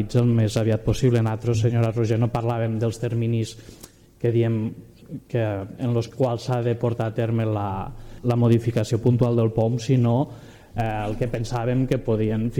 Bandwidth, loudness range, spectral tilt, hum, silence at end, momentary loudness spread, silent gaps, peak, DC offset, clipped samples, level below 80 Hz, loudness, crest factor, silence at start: 11.5 kHz; 4 LU; -8 dB/octave; none; 0 s; 9 LU; none; -8 dBFS; under 0.1%; under 0.1%; -44 dBFS; -23 LUFS; 14 dB; 0 s